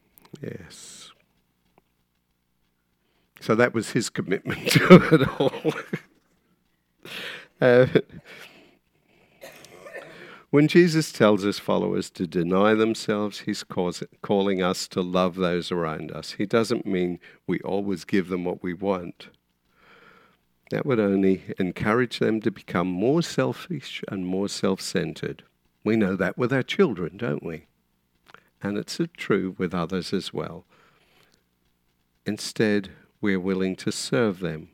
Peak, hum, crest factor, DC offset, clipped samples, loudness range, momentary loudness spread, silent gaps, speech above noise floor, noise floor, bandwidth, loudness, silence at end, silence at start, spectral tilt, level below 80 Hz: 0 dBFS; 60 Hz at -50 dBFS; 26 dB; under 0.1%; under 0.1%; 9 LU; 18 LU; none; 48 dB; -72 dBFS; 16.5 kHz; -24 LUFS; 0.05 s; 0.35 s; -6 dB/octave; -60 dBFS